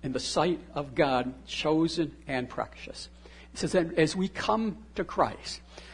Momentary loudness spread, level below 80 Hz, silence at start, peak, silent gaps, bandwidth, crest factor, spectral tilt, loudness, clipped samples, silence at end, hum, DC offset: 14 LU; -52 dBFS; 0 s; -10 dBFS; none; 11 kHz; 20 dB; -5 dB/octave; -29 LUFS; under 0.1%; 0 s; none; under 0.1%